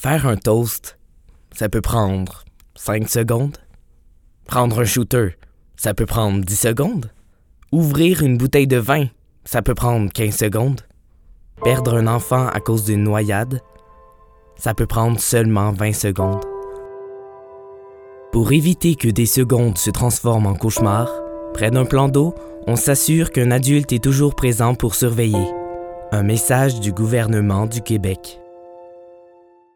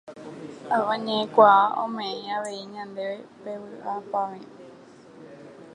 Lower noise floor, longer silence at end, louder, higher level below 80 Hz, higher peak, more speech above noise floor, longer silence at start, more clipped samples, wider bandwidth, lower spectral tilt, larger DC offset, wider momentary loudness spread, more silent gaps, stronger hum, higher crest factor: about the same, -50 dBFS vs -48 dBFS; first, 0.7 s vs 0 s; first, -18 LUFS vs -24 LUFS; first, -36 dBFS vs -78 dBFS; about the same, 0 dBFS vs -2 dBFS; first, 34 dB vs 24 dB; about the same, 0 s vs 0.05 s; neither; first, 19 kHz vs 10.5 kHz; about the same, -5.5 dB/octave vs -4.5 dB/octave; neither; second, 13 LU vs 25 LU; neither; neither; second, 18 dB vs 24 dB